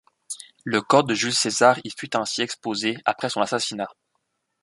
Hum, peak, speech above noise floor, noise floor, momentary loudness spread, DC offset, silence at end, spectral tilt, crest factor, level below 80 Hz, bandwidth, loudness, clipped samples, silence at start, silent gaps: none; -2 dBFS; 52 dB; -75 dBFS; 15 LU; under 0.1%; 0.7 s; -3 dB/octave; 22 dB; -68 dBFS; 11.5 kHz; -22 LUFS; under 0.1%; 0.3 s; none